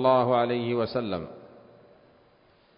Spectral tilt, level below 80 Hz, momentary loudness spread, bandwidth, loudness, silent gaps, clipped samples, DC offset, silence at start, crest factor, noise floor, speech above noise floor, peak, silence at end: -10.5 dB/octave; -60 dBFS; 19 LU; 5.4 kHz; -26 LUFS; none; under 0.1%; under 0.1%; 0 s; 20 dB; -61 dBFS; 36 dB; -8 dBFS; 1.3 s